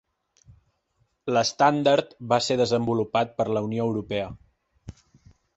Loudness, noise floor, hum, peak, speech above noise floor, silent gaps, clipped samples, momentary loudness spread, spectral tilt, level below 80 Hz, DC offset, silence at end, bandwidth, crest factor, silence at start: -24 LUFS; -71 dBFS; none; -6 dBFS; 47 dB; none; under 0.1%; 10 LU; -5 dB/octave; -56 dBFS; under 0.1%; 0.65 s; 8.2 kHz; 20 dB; 1.25 s